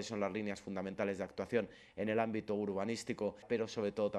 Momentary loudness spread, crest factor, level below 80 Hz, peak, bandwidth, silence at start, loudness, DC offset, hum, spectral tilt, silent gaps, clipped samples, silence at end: 6 LU; 18 dB; -72 dBFS; -20 dBFS; 12 kHz; 0 s; -39 LUFS; under 0.1%; none; -5.5 dB/octave; none; under 0.1%; 0 s